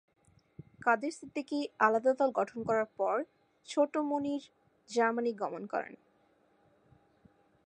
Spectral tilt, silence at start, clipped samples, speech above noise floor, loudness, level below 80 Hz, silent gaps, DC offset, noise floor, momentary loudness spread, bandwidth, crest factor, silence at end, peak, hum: -5 dB/octave; 0.85 s; under 0.1%; 38 dB; -32 LUFS; -78 dBFS; none; under 0.1%; -69 dBFS; 10 LU; 10 kHz; 22 dB; 1.7 s; -12 dBFS; none